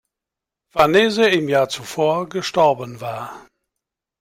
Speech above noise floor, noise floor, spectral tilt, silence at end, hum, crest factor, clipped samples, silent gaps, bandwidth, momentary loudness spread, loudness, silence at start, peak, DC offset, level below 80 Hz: 68 dB; -86 dBFS; -4.5 dB/octave; 0.8 s; none; 18 dB; under 0.1%; none; 16 kHz; 14 LU; -18 LUFS; 0.75 s; -2 dBFS; under 0.1%; -58 dBFS